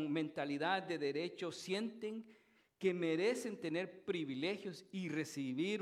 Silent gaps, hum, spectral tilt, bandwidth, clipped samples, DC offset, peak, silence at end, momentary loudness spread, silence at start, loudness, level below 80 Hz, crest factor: none; none; -5 dB/octave; 14.5 kHz; under 0.1%; under 0.1%; -20 dBFS; 0 s; 9 LU; 0 s; -40 LUFS; -88 dBFS; 20 dB